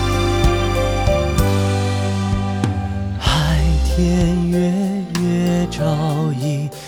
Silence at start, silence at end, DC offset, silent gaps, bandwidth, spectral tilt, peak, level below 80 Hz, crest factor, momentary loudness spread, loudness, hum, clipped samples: 0 s; 0 s; under 0.1%; none; 19 kHz; -6 dB/octave; -2 dBFS; -24 dBFS; 14 dB; 4 LU; -18 LUFS; none; under 0.1%